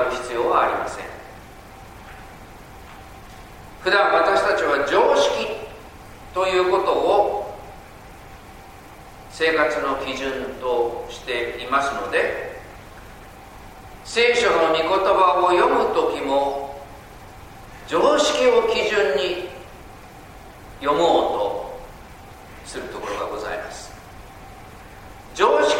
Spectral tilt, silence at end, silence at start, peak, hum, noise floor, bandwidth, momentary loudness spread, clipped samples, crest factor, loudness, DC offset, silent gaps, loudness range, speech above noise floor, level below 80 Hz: -3.5 dB/octave; 0 s; 0 s; -2 dBFS; none; -42 dBFS; 16.5 kHz; 25 LU; under 0.1%; 20 dB; -20 LUFS; under 0.1%; none; 8 LU; 23 dB; -48 dBFS